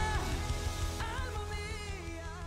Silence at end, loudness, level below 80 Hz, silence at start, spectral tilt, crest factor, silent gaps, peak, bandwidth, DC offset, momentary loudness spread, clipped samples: 0 s; -38 LUFS; -40 dBFS; 0 s; -4.5 dB/octave; 14 dB; none; -22 dBFS; 16 kHz; under 0.1%; 6 LU; under 0.1%